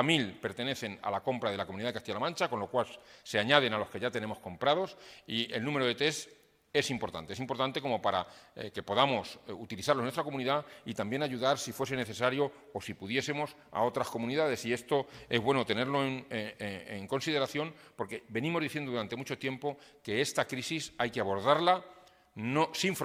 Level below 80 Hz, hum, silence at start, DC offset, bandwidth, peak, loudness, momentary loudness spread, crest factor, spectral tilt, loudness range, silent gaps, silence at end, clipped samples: -70 dBFS; none; 0 s; under 0.1%; 16.5 kHz; -6 dBFS; -33 LUFS; 11 LU; 26 dB; -4.5 dB/octave; 3 LU; none; 0 s; under 0.1%